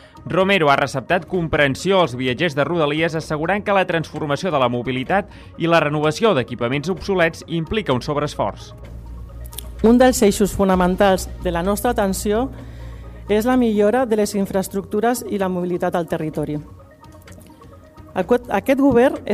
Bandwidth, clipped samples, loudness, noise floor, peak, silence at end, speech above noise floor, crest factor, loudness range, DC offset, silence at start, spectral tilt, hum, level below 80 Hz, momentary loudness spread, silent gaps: 15.5 kHz; under 0.1%; -19 LUFS; -43 dBFS; -4 dBFS; 0 s; 25 dB; 14 dB; 5 LU; under 0.1%; 0.15 s; -5.5 dB/octave; none; -38 dBFS; 13 LU; none